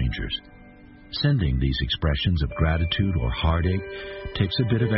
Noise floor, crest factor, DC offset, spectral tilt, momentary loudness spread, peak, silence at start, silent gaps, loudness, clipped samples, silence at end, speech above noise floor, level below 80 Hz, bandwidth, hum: -47 dBFS; 16 dB; under 0.1%; -10.5 dB/octave; 10 LU; -8 dBFS; 0 s; none; -25 LUFS; under 0.1%; 0 s; 24 dB; -30 dBFS; 5.8 kHz; none